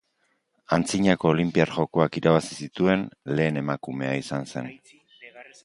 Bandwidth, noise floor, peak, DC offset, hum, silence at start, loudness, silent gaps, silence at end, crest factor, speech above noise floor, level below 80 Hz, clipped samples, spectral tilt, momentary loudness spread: 11.5 kHz; -71 dBFS; -4 dBFS; under 0.1%; none; 0.7 s; -24 LUFS; none; 0.2 s; 22 dB; 47 dB; -56 dBFS; under 0.1%; -6 dB/octave; 13 LU